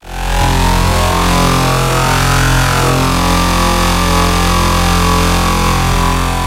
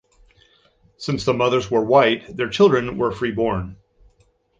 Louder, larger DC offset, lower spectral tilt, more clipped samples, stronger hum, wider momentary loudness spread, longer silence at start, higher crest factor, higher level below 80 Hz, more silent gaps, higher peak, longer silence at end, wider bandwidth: first, -12 LUFS vs -19 LUFS; neither; second, -4 dB/octave vs -6 dB/octave; neither; neither; second, 2 LU vs 11 LU; second, 0.05 s vs 1 s; second, 12 dB vs 18 dB; first, -18 dBFS vs -48 dBFS; neither; about the same, 0 dBFS vs -2 dBFS; second, 0 s vs 0.85 s; first, 16 kHz vs 7.8 kHz